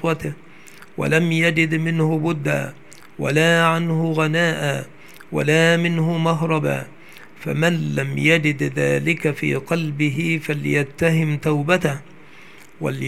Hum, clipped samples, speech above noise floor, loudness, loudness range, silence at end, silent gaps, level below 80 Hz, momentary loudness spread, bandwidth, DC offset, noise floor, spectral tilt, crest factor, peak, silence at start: none; under 0.1%; 26 dB; -20 LUFS; 2 LU; 0 s; none; -58 dBFS; 12 LU; 14.5 kHz; 0.6%; -45 dBFS; -6 dB/octave; 20 dB; 0 dBFS; 0 s